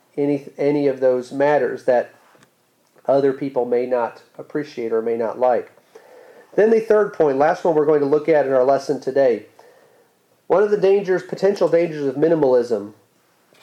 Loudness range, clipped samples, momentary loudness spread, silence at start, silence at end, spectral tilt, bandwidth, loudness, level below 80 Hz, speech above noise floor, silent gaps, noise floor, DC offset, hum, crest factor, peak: 5 LU; under 0.1%; 9 LU; 0.15 s; 0.7 s; -7 dB/octave; 10 kHz; -19 LUFS; -68 dBFS; 43 dB; none; -61 dBFS; under 0.1%; none; 14 dB; -6 dBFS